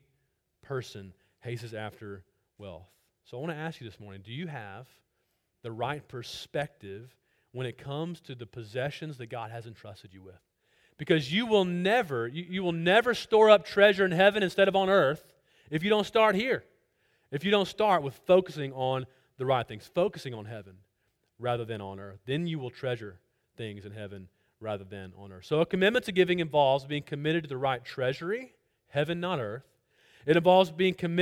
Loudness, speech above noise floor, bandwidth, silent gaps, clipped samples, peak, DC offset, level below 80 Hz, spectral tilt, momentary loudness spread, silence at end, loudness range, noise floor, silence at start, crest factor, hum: -28 LUFS; 49 dB; 16 kHz; none; under 0.1%; -6 dBFS; under 0.1%; -66 dBFS; -6 dB/octave; 22 LU; 0 s; 17 LU; -77 dBFS; 0.7 s; 24 dB; none